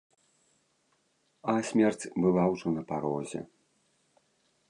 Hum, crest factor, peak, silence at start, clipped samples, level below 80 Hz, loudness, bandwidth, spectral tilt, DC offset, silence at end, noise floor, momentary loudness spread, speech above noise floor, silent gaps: none; 20 dB; -12 dBFS; 1.45 s; under 0.1%; -66 dBFS; -29 LUFS; 11 kHz; -6.5 dB/octave; under 0.1%; 1.25 s; -73 dBFS; 13 LU; 44 dB; none